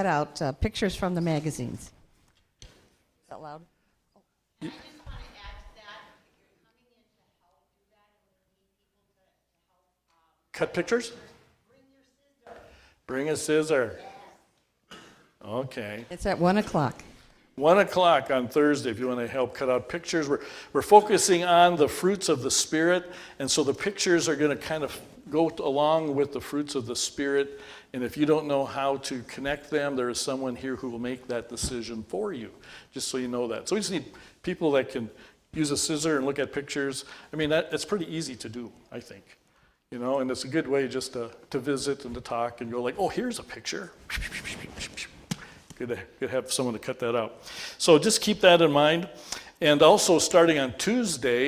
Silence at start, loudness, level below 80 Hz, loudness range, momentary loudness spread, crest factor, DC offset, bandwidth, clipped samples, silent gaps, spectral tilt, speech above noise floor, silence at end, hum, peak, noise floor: 0 s; -26 LUFS; -52 dBFS; 13 LU; 19 LU; 24 dB; under 0.1%; 16 kHz; under 0.1%; none; -4 dB/octave; 49 dB; 0 s; none; -2 dBFS; -75 dBFS